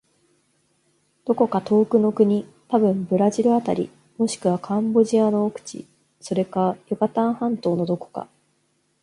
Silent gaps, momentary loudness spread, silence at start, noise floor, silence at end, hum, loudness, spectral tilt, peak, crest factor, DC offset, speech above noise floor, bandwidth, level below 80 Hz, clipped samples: none; 13 LU; 1.25 s; -67 dBFS; 0.8 s; none; -21 LUFS; -7 dB/octave; -4 dBFS; 18 dB; under 0.1%; 47 dB; 11.5 kHz; -66 dBFS; under 0.1%